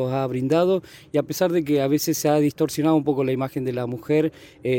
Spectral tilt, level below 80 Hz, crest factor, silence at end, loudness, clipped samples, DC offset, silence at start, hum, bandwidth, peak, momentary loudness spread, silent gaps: -6 dB/octave; -60 dBFS; 16 dB; 0 s; -22 LUFS; under 0.1%; under 0.1%; 0 s; none; 17 kHz; -6 dBFS; 7 LU; none